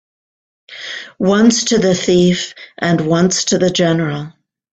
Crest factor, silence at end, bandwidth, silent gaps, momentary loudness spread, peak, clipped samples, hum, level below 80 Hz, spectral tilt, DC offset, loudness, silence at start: 14 dB; 0.5 s; 9 kHz; none; 15 LU; 0 dBFS; under 0.1%; none; -50 dBFS; -4.5 dB/octave; under 0.1%; -14 LUFS; 0.7 s